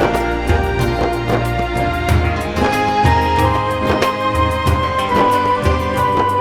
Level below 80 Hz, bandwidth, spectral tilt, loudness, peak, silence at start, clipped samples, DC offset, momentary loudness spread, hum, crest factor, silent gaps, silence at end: -24 dBFS; 17 kHz; -6 dB/octave; -16 LUFS; 0 dBFS; 0 s; under 0.1%; under 0.1%; 4 LU; none; 14 dB; none; 0 s